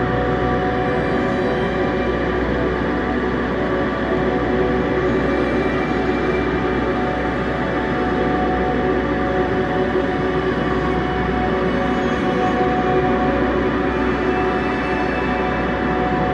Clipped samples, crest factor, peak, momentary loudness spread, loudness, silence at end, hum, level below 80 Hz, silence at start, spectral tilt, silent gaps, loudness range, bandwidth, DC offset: under 0.1%; 14 dB; -6 dBFS; 2 LU; -19 LUFS; 0 s; none; -32 dBFS; 0 s; -7.5 dB/octave; none; 1 LU; 8.8 kHz; under 0.1%